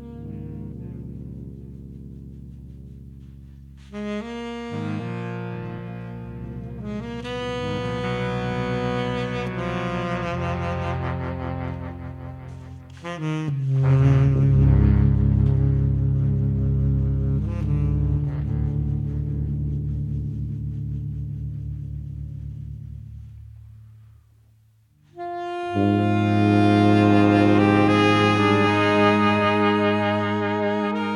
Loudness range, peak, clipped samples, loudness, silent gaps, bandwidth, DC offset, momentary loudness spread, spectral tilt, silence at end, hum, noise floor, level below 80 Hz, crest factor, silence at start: 19 LU; -4 dBFS; under 0.1%; -22 LUFS; none; 10 kHz; under 0.1%; 21 LU; -8 dB/octave; 0 s; none; -58 dBFS; -34 dBFS; 18 dB; 0 s